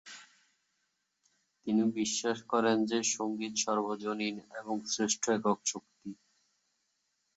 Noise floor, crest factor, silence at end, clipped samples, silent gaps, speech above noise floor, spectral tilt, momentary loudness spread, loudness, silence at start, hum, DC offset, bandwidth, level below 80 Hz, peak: -80 dBFS; 20 dB; 1.25 s; under 0.1%; none; 48 dB; -3 dB/octave; 16 LU; -32 LUFS; 0.05 s; none; under 0.1%; 8.2 kHz; -78 dBFS; -14 dBFS